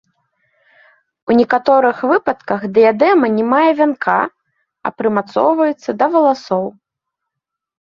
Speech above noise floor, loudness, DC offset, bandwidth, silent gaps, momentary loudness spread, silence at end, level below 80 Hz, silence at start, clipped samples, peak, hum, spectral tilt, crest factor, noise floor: 67 dB; -14 LUFS; under 0.1%; 7.2 kHz; none; 9 LU; 1.2 s; -60 dBFS; 1.25 s; under 0.1%; 0 dBFS; none; -7 dB/octave; 16 dB; -80 dBFS